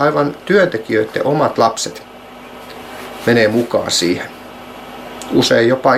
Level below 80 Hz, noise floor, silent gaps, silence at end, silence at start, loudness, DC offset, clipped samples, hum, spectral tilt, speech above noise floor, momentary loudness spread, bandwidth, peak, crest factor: -52 dBFS; -35 dBFS; none; 0 s; 0 s; -15 LUFS; under 0.1%; under 0.1%; none; -4.5 dB/octave; 21 dB; 21 LU; 16 kHz; 0 dBFS; 16 dB